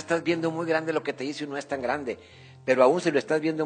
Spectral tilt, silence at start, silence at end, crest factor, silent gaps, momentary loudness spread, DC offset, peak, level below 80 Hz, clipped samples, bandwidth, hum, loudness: -5.5 dB/octave; 0 s; 0 s; 20 dB; none; 13 LU; under 0.1%; -6 dBFS; -68 dBFS; under 0.1%; 9.4 kHz; none; -26 LUFS